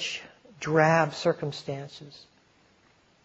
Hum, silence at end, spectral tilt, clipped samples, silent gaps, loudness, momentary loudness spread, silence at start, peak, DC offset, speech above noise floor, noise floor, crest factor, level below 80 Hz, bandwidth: none; 1.1 s; -5 dB/octave; under 0.1%; none; -27 LUFS; 22 LU; 0 s; -6 dBFS; under 0.1%; 36 dB; -63 dBFS; 22 dB; -68 dBFS; 8 kHz